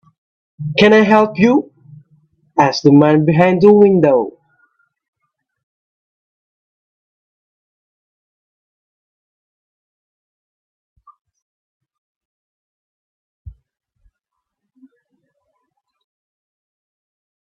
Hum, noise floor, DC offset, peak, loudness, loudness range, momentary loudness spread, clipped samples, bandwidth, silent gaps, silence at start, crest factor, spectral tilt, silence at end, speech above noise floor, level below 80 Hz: none; -79 dBFS; under 0.1%; 0 dBFS; -12 LUFS; 6 LU; 13 LU; under 0.1%; 7 kHz; 5.08-5.13 s, 5.63-10.96 s, 11.21-11.25 s, 11.42-11.80 s, 11.98-13.45 s; 0.6 s; 18 dB; -7 dB/octave; 4.1 s; 68 dB; -56 dBFS